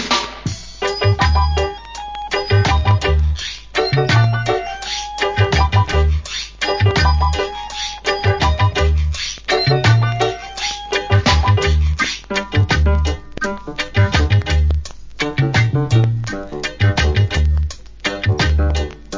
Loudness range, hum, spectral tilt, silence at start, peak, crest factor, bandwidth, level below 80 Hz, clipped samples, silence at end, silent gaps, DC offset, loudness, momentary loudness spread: 1 LU; none; -5 dB/octave; 0 s; 0 dBFS; 16 dB; 7.6 kHz; -22 dBFS; under 0.1%; 0 s; none; under 0.1%; -17 LUFS; 9 LU